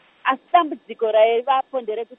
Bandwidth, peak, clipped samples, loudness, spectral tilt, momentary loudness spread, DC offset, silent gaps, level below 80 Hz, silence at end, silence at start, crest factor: 3.9 kHz; -2 dBFS; under 0.1%; -20 LUFS; -6.5 dB/octave; 10 LU; under 0.1%; none; -80 dBFS; 0.05 s; 0.25 s; 18 dB